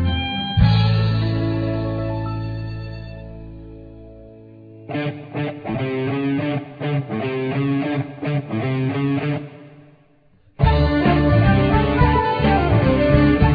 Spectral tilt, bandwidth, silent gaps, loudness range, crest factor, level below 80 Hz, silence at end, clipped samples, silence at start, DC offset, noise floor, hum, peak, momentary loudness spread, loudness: -9.5 dB/octave; 5 kHz; none; 12 LU; 18 dB; -30 dBFS; 0 s; under 0.1%; 0 s; under 0.1%; -54 dBFS; none; -2 dBFS; 15 LU; -20 LUFS